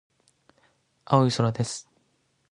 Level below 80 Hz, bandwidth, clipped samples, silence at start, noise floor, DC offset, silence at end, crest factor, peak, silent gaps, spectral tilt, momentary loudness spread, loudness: -64 dBFS; 11 kHz; under 0.1%; 1.1 s; -70 dBFS; under 0.1%; 0.7 s; 22 dB; -6 dBFS; none; -6 dB/octave; 11 LU; -25 LUFS